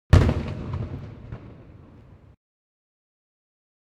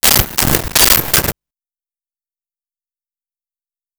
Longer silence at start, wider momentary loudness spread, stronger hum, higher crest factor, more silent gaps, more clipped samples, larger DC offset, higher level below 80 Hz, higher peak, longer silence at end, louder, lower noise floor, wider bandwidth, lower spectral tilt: about the same, 0.1 s vs 0.05 s; first, 28 LU vs 5 LU; neither; first, 26 dB vs 18 dB; neither; neither; neither; about the same, -32 dBFS vs -32 dBFS; about the same, -2 dBFS vs 0 dBFS; second, 2.35 s vs 2.65 s; second, -25 LUFS vs -10 LUFS; second, -49 dBFS vs under -90 dBFS; second, 10 kHz vs over 20 kHz; first, -7.5 dB/octave vs -2 dB/octave